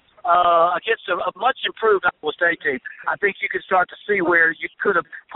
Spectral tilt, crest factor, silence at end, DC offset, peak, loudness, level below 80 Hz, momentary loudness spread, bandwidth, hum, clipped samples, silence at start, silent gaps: -0.5 dB/octave; 16 dB; 0 s; under 0.1%; -4 dBFS; -20 LUFS; -62 dBFS; 8 LU; 4.1 kHz; none; under 0.1%; 0.25 s; none